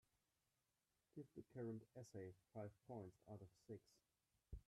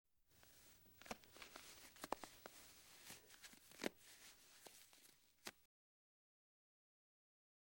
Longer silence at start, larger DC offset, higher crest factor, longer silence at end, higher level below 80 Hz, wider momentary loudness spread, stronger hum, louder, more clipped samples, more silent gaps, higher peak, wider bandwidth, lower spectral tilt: first, 1.15 s vs 0.2 s; neither; second, 18 dB vs 36 dB; second, 0.05 s vs 1.95 s; first, -74 dBFS vs -82 dBFS; second, 8 LU vs 15 LU; neither; about the same, -59 LUFS vs -57 LUFS; neither; neither; second, -42 dBFS vs -24 dBFS; second, 12.5 kHz vs over 20 kHz; first, -8 dB/octave vs -2 dB/octave